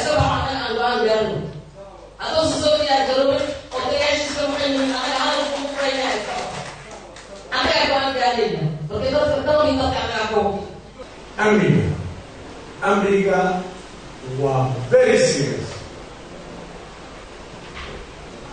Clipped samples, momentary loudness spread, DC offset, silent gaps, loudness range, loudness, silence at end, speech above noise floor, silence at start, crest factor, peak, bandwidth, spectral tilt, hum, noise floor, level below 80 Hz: under 0.1%; 20 LU; under 0.1%; none; 3 LU; -20 LUFS; 0 s; 23 dB; 0 s; 18 dB; -4 dBFS; 9.6 kHz; -4.5 dB/octave; none; -40 dBFS; -44 dBFS